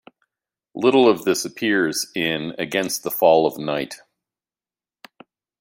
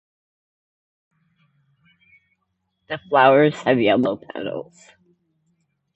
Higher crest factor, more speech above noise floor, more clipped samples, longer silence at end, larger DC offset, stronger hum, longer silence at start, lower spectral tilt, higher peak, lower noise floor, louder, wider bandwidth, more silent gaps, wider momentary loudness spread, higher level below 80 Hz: about the same, 20 dB vs 22 dB; first, over 70 dB vs 55 dB; neither; first, 1.65 s vs 1.35 s; neither; neither; second, 0.75 s vs 2.9 s; second, -3.5 dB/octave vs -6.5 dB/octave; about the same, -2 dBFS vs -2 dBFS; first, under -90 dBFS vs -74 dBFS; about the same, -20 LUFS vs -18 LUFS; first, 16.5 kHz vs 8.2 kHz; neither; second, 11 LU vs 18 LU; about the same, -66 dBFS vs -66 dBFS